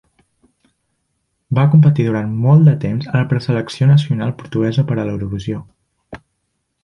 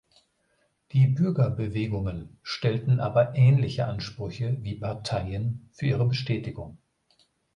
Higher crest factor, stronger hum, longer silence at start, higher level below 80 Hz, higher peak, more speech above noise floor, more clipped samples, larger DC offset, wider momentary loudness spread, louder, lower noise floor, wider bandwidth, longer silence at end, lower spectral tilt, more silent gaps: about the same, 14 dB vs 16 dB; neither; first, 1.5 s vs 0.95 s; about the same, -46 dBFS vs -50 dBFS; first, -2 dBFS vs -10 dBFS; first, 56 dB vs 45 dB; neither; neither; about the same, 12 LU vs 13 LU; first, -15 LUFS vs -26 LUFS; about the same, -70 dBFS vs -71 dBFS; second, 7 kHz vs 8.8 kHz; about the same, 0.7 s vs 0.8 s; about the same, -8.5 dB/octave vs -8 dB/octave; neither